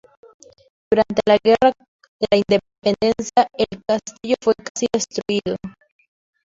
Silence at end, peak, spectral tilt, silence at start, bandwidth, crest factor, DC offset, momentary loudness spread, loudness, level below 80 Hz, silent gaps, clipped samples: 0.75 s; -2 dBFS; -4.5 dB/octave; 0.9 s; 7.8 kHz; 18 dB; under 0.1%; 8 LU; -19 LUFS; -54 dBFS; 1.88-1.99 s, 2.08-2.20 s, 4.70-4.75 s; under 0.1%